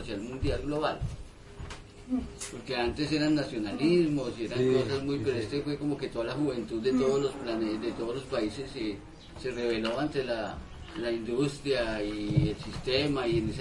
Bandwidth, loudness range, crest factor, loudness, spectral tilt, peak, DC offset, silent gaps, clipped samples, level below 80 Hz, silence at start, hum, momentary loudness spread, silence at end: 11.5 kHz; 4 LU; 20 dB; -31 LUFS; -6 dB/octave; -12 dBFS; under 0.1%; none; under 0.1%; -46 dBFS; 0 s; none; 12 LU; 0 s